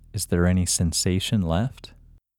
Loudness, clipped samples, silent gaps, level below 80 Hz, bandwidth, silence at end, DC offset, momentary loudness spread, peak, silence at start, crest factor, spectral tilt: -23 LUFS; under 0.1%; none; -40 dBFS; 17.5 kHz; 0.55 s; under 0.1%; 5 LU; -8 dBFS; 0.15 s; 16 dB; -4.5 dB/octave